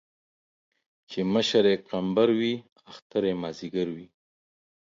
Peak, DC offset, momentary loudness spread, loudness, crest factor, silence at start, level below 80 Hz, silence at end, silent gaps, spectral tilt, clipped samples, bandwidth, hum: -8 dBFS; under 0.1%; 11 LU; -26 LUFS; 20 dB; 1.1 s; -66 dBFS; 0.8 s; 2.72-2.76 s, 3.02-3.10 s; -5.5 dB/octave; under 0.1%; 7.6 kHz; none